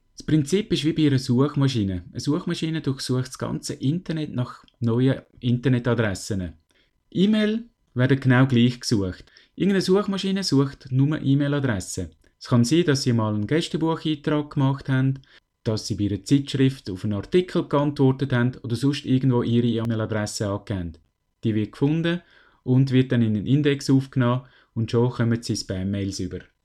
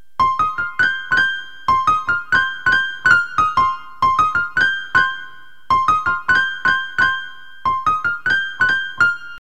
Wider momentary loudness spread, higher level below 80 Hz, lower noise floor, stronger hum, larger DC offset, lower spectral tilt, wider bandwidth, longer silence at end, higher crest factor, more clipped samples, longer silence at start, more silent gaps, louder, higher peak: first, 10 LU vs 5 LU; about the same, -52 dBFS vs -48 dBFS; first, -65 dBFS vs -40 dBFS; neither; second, under 0.1% vs 2%; first, -6.5 dB/octave vs -2.5 dB/octave; first, 12.5 kHz vs 11 kHz; first, 0.2 s vs 0 s; about the same, 16 dB vs 16 dB; neither; about the same, 0.2 s vs 0.2 s; neither; second, -23 LUFS vs -17 LUFS; second, -6 dBFS vs -2 dBFS